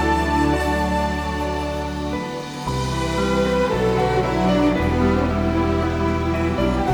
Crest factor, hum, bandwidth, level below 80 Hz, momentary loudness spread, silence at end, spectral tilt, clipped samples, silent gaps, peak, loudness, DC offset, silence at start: 14 dB; none; 17.5 kHz; -30 dBFS; 7 LU; 0 s; -6.5 dB/octave; under 0.1%; none; -6 dBFS; -21 LUFS; under 0.1%; 0 s